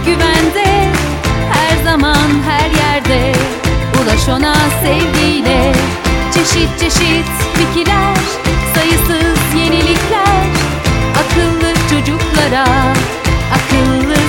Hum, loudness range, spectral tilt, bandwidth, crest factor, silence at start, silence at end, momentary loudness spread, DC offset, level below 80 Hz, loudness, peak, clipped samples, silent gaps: none; 1 LU; -4.5 dB/octave; 18 kHz; 12 dB; 0 s; 0 s; 3 LU; under 0.1%; -20 dBFS; -11 LUFS; 0 dBFS; under 0.1%; none